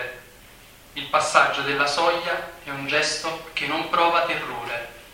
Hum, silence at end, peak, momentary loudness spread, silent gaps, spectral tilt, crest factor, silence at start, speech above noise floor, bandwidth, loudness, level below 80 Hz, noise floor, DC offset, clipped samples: none; 0 s; -2 dBFS; 14 LU; none; -2 dB/octave; 22 dB; 0 s; 25 dB; 16.5 kHz; -22 LUFS; -56 dBFS; -48 dBFS; under 0.1%; under 0.1%